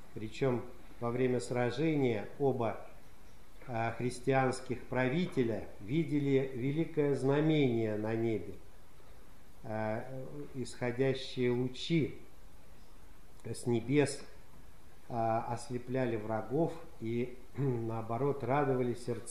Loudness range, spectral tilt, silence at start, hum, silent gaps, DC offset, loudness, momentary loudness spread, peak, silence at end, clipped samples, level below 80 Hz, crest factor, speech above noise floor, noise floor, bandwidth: 5 LU; -7 dB/octave; 0.05 s; none; none; 0.6%; -34 LUFS; 11 LU; -16 dBFS; 0 s; under 0.1%; -60 dBFS; 18 dB; 24 dB; -58 dBFS; 14 kHz